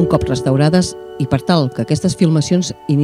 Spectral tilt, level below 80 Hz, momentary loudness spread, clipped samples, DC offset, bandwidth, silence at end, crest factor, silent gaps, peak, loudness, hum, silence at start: -6.5 dB/octave; -38 dBFS; 6 LU; under 0.1%; under 0.1%; 13 kHz; 0 s; 14 dB; none; 0 dBFS; -16 LUFS; none; 0 s